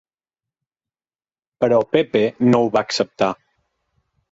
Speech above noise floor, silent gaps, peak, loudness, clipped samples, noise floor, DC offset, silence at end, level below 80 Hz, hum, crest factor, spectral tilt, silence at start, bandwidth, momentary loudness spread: over 73 dB; none; -4 dBFS; -18 LUFS; under 0.1%; under -90 dBFS; under 0.1%; 1 s; -60 dBFS; none; 18 dB; -5.5 dB/octave; 1.6 s; 7.8 kHz; 6 LU